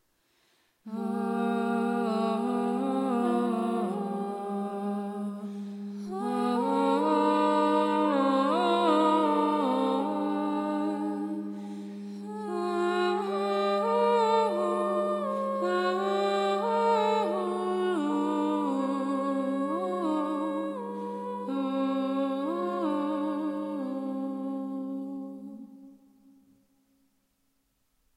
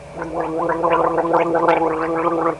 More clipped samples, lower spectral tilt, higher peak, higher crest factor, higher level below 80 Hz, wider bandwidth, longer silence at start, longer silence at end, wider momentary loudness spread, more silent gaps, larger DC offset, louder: neither; about the same, -6.5 dB/octave vs -7 dB/octave; second, -12 dBFS vs -2 dBFS; about the same, 16 dB vs 16 dB; second, -86 dBFS vs -48 dBFS; first, 15 kHz vs 11 kHz; first, 0.85 s vs 0 s; first, 2.25 s vs 0 s; first, 11 LU vs 7 LU; neither; neither; second, -29 LUFS vs -19 LUFS